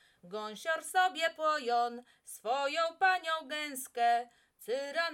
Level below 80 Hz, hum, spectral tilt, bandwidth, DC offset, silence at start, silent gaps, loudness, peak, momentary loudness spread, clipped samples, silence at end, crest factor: -86 dBFS; none; -1 dB/octave; 18 kHz; under 0.1%; 0.25 s; none; -33 LUFS; -16 dBFS; 14 LU; under 0.1%; 0 s; 18 dB